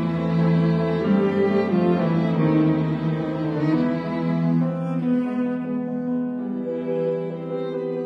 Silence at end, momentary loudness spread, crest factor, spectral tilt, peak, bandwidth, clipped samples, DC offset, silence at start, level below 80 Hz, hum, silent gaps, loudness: 0 s; 7 LU; 14 dB; -10 dB/octave; -8 dBFS; 5.6 kHz; under 0.1%; under 0.1%; 0 s; -54 dBFS; none; none; -22 LUFS